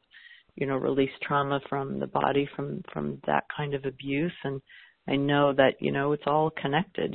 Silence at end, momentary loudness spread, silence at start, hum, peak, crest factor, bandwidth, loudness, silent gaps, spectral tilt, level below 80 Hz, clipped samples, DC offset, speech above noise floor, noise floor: 0 s; 11 LU; 0.15 s; none; -6 dBFS; 22 dB; 4.3 kHz; -28 LUFS; none; -10.5 dB/octave; -60 dBFS; under 0.1%; under 0.1%; 26 dB; -54 dBFS